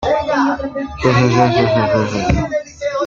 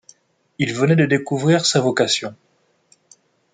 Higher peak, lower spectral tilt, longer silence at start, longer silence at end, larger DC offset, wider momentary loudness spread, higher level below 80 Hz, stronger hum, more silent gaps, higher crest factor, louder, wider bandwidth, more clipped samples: about the same, -2 dBFS vs -2 dBFS; first, -6.5 dB/octave vs -4.5 dB/octave; second, 0 s vs 0.6 s; second, 0 s vs 1.2 s; neither; about the same, 9 LU vs 8 LU; first, -32 dBFS vs -62 dBFS; neither; neither; about the same, 14 dB vs 18 dB; about the same, -16 LUFS vs -18 LUFS; second, 7.6 kHz vs 9.6 kHz; neither